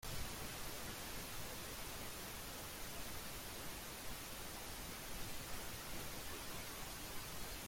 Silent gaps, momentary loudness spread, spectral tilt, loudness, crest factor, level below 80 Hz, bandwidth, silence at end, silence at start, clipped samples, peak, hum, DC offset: none; 1 LU; -2.5 dB/octave; -48 LUFS; 14 dB; -56 dBFS; 16.5 kHz; 0 s; 0 s; under 0.1%; -32 dBFS; none; under 0.1%